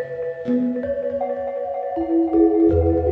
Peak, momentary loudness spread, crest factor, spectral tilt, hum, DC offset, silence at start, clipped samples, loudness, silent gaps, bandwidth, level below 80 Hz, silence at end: -6 dBFS; 10 LU; 14 dB; -11.5 dB/octave; none; under 0.1%; 0 s; under 0.1%; -21 LUFS; none; 3.8 kHz; -34 dBFS; 0 s